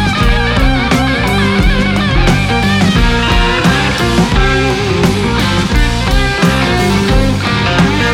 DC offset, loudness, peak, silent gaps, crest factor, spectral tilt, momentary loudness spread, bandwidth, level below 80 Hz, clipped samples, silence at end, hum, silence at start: under 0.1%; -11 LUFS; 0 dBFS; none; 10 dB; -5.5 dB/octave; 2 LU; 16 kHz; -16 dBFS; under 0.1%; 0 s; none; 0 s